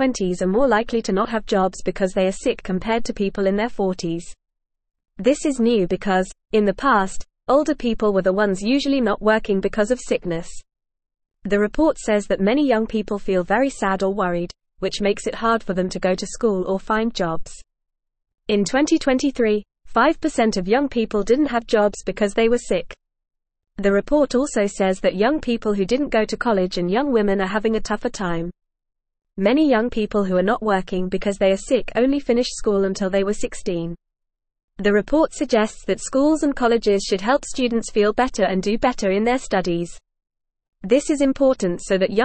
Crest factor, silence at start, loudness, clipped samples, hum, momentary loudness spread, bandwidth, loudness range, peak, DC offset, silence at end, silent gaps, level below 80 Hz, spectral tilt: 16 dB; 0 s; -20 LUFS; under 0.1%; none; 7 LU; 8.8 kHz; 3 LU; -4 dBFS; 0.4%; 0 s; 34.64-34.68 s, 40.68-40.73 s; -42 dBFS; -5 dB/octave